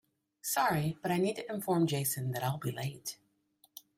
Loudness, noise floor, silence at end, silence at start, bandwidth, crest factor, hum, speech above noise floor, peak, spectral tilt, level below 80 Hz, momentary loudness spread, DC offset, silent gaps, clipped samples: -33 LUFS; -70 dBFS; 0.2 s; 0.45 s; 16 kHz; 18 dB; none; 37 dB; -18 dBFS; -5 dB/octave; -70 dBFS; 13 LU; under 0.1%; none; under 0.1%